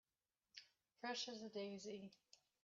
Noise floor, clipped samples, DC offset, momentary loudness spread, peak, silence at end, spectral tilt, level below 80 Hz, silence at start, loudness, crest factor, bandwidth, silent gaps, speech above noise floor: under -90 dBFS; under 0.1%; under 0.1%; 15 LU; -36 dBFS; 0.3 s; -2 dB/octave; under -90 dBFS; 0.55 s; -50 LUFS; 18 dB; 7.4 kHz; none; over 39 dB